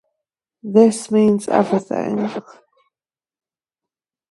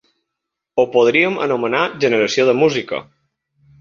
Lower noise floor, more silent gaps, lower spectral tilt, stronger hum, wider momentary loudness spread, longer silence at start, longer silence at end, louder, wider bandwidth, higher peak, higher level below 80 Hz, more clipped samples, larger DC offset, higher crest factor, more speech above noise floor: first, under -90 dBFS vs -80 dBFS; neither; first, -6.5 dB/octave vs -4.5 dB/octave; neither; about the same, 12 LU vs 10 LU; about the same, 0.65 s vs 0.75 s; first, 1.9 s vs 0.8 s; about the same, -17 LUFS vs -16 LUFS; first, 11.5 kHz vs 7.4 kHz; about the same, 0 dBFS vs -2 dBFS; about the same, -64 dBFS vs -60 dBFS; neither; neither; about the same, 20 dB vs 16 dB; first, over 73 dB vs 64 dB